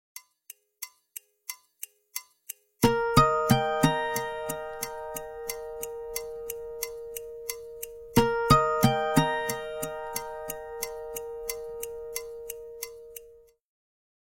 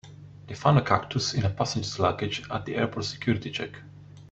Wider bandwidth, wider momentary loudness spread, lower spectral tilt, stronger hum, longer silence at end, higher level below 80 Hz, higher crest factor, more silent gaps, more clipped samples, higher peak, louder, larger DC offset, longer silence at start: first, 16.5 kHz vs 8.2 kHz; first, 21 LU vs 17 LU; about the same, -4.5 dB/octave vs -5.5 dB/octave; neither; first, 1 s vs 0.05 s; first, -48 dBFS vs -54 dBFS; about the same, 24 dB vs 24 dB; neither; neither; about the same, -6 dBFS vs -4 dBFS; about the same, -29 LUFS vs -27 LUFS; neither; about the same, 0.15 s vs 0.05 s